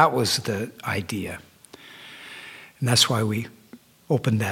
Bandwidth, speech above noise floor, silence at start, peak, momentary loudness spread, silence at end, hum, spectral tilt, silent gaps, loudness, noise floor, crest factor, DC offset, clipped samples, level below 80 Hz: 17 kHz; 27 dB; 0 s; -4 dBFS; 22 LU; 0 s; none; -4 dB/octave; none; -24 LUFS; -50 dBFS; 22 dB; under 0.1%; under 0.1%; -60 dBFS